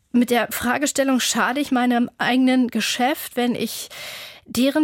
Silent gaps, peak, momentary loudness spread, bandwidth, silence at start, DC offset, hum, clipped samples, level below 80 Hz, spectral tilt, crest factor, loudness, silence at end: none; -8 dBFS; 11 LU; 17 kHz; 0.15 s; under 0.1%; none; under 0.1%; -58 dBFS; -3 dB/octave; 14 dB; -20 LUFS; 0 s